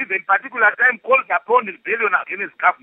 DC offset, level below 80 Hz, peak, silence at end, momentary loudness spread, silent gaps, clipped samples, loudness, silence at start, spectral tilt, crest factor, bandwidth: under 0.1%; -84 dBFS; -2 dBFS; 0.1 s; 6 LU; none; under 0.1%; -17 LUFS; 0 s; -7 dB/octave; 16 dB; 3.9 kHz